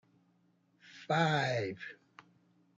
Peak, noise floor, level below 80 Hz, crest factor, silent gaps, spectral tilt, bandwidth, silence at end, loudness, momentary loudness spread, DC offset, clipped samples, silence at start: -16 dBFS; -72 dBFS; -80 dBFS; 22 dB; none; -5.5 dB/octave; 7.8 kHz; 0.85 s; -33 LUFS; 18 LU; under 0.1%; under 0.1%; 0.9 s